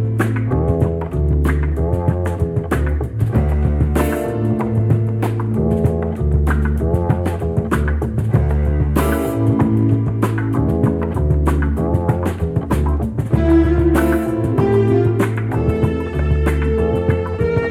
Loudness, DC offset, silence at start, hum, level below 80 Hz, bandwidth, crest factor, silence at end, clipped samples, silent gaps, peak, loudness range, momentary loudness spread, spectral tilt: -18 LUFS; under 0.1%; 0 s; none; -22 dBFS; 15 kHz; 12 dB; 0 s; under 0.1%; none; -4 dBFS; 2 LU; 5 LU; -8.5 dB/octave